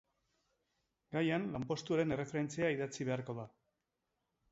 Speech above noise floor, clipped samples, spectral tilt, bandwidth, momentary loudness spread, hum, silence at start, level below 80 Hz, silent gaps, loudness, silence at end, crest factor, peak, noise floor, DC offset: 50 dB; under 0.1%; -5.5 dB/octave; 7.6 kHz; 9 LU; none; 1.1 s; -70 dBFS; none; -38 LUFS; 1.05 s; 18 dB; -22 dBFS; -87 dBFS; under 0.1%